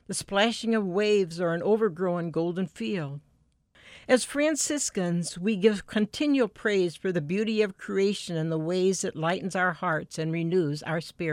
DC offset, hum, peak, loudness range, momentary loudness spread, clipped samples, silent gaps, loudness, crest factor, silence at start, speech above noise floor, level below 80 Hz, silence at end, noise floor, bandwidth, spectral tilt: under 0.1%; none; -8 dBFS; 2 LU; 6 LU; under 0.1%; none; -27 LUFS; 18 dB; 0.1 s; 38 dB; -64 dBFS; 0 s; -65 dBFS; 16 kHz; -4.5 dB/octave